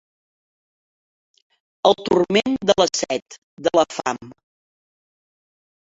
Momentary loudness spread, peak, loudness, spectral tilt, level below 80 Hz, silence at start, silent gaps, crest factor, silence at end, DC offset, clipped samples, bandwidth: 9 LU; 0 dBFS; -20 LUFS; -3.5 dB/octave; -58 dBFS; 1.85 s; 3.22-3.26 s, 3.38-3.57 s; 24 dB; 1.65 s; under 0.1%; under 0.1%; 8 kHz